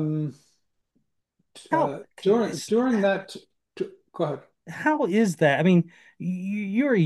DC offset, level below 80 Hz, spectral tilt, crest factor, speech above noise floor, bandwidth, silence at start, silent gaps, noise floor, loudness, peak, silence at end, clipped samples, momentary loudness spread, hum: under 0.1%; -74 dBFS; -6.5 dB/octave; 18 dB; 51 dB; 12.5 kHz; 0 s; none; -75 dBFS; -25 LUFS; -6 dBFS; 0 s; under 0.1%; 14 LU; none